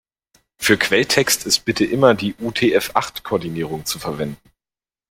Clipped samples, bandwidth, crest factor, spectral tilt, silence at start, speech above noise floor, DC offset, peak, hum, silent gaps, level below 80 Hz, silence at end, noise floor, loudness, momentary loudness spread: under 0.1%; 16.5 kHz; 20 dB; -3.5 dB/octave; 0.6 s; over 71 dB; under 0.1%; 0 dBFS; none; none; -52 dBFS; 0.75 s; under -90 dBFS; -18 LUFS; 10 LU